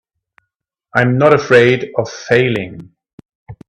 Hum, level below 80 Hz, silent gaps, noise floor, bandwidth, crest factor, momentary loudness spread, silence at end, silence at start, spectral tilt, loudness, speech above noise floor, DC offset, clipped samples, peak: none; -52 dBFS; 3.13-3.18 s, 3.35-3.46 s; -75 dBFS; 10 kHz; 16 dB; 12 LU; 0.15 s; 0.95 s; -6.5 dB/octave; -13 LUFS; 63 dB; under 0.1%; under 0.1%; 0 dBFS